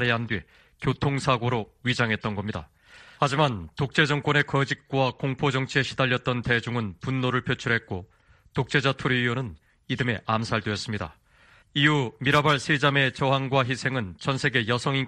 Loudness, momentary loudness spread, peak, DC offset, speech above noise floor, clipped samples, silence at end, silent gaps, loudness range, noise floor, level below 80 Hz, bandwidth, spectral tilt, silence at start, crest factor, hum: -25 LUFS; 10 LU; -6 dBFS; under 0.1%; 32 dB; under 0.1%; 0 s; none; 4 LU; -57 dBFS; -54 dBFS; 10.5 kHz; -5.5 dB/octave; 0 s; 20 dB; none